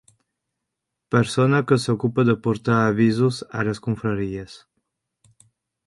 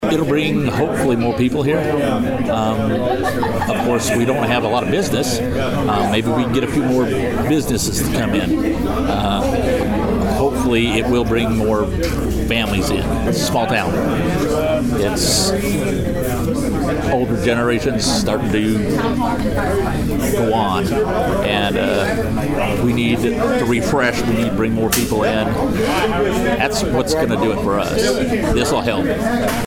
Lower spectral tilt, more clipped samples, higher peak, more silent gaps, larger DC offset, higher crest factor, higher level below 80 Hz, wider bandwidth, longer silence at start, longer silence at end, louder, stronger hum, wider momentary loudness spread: first, -7 dB/octave vs -5 dB/octave; neither; about the same, -2 dBFS vs -2 dBFS; neither; neither; about the same, 20 dB vs 16 dB; second, -54 dBFS vs -30 dBFS; second, 11.5 kHz vs 18 kHz; first, 1.1 s vs 0 s; first, 1.3 s vs 0 s; second, -21 LUFS vs -17 LUFS; neither; first, 8 LU vs 3 LU